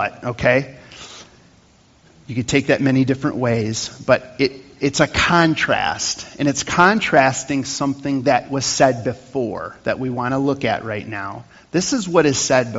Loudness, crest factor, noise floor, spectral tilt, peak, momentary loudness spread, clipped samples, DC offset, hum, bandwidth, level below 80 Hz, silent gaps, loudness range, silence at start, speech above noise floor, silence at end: -19 LUFS; 20 dB; -52 dBFS; -4.5 dB/octave; 0 dBFS; 12 LU; under 0.1%; under 0.1%; none; 8 kHz; -48 dBFS; none; 4 LU; 0 s; 34 dB; 0 s